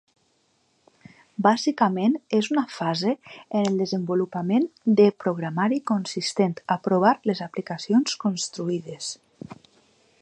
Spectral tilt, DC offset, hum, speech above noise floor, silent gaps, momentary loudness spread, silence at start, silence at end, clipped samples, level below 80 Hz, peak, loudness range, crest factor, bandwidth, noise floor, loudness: -5.5 dB/octave; under 0.1%; none; 44 dB; none; 12 LU; 1.4 s; 0.7 s; under 0.1%; -72 dBFS; -4 dBFS; 3 LU; 20 dB; 9.8 kHz; -67 dBFS; -24 LUFS